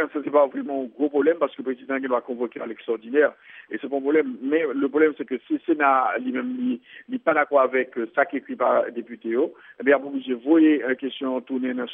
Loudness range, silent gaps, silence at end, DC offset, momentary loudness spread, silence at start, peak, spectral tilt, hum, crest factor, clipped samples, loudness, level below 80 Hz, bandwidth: 3 LU; none; 0 s; under 0.1%; 11 LU; 0 s; -6 dBFS; -3 dB/octave; none; 18 dB; under 0.1%; -23 LUFS; -82 dBFS; 3.8 kHz